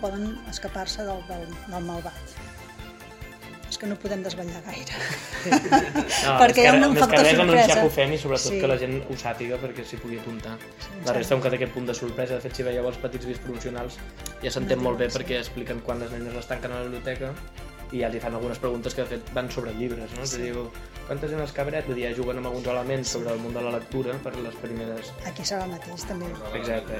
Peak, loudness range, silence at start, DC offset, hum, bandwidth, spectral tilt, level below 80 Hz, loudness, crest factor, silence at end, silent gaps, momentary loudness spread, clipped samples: 0 dBFS; 15 LU; 0 s; under 0.1%; none; 17 kHz; -4 dB/octave; -44 dBFS; -25 LUFS; 26 dB; 0 s; none; 19 LU; under 0.1%